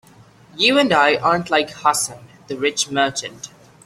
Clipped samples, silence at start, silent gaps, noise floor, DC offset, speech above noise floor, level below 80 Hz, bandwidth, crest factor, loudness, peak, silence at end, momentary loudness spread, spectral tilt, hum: under 0.1%; 0.55 s; none; -48 dBFS; under 0.1%; 29 dB; -58 dBFS; 15.5 kHz; 18 dB; -18 LUFS; -2 dBFS; 0.4 s; 18 LU; -2.5 dB/octave; none